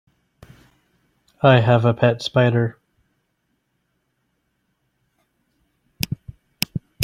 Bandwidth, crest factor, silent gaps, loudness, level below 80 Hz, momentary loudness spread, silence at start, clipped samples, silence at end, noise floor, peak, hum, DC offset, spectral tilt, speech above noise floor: 16 kHz; 22 dB; none; -19 LUFS; -54 dBFS; 13 LU; 1.45 s; under 0.1%; 0 s; -71 dBFS; 0 dBFS; none; under 0.1%; -6.5 dB/octave; 55 dB